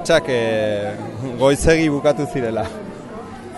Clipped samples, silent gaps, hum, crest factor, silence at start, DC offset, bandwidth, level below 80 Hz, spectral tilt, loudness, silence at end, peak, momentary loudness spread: under 0.1%; none; none; 18 dB; 0 s; under 0.1%; 11.5 kHz; -36 dBFS; -5 dB/octave; -19 LUFS; 0 s; -2 dBFS; 17 LU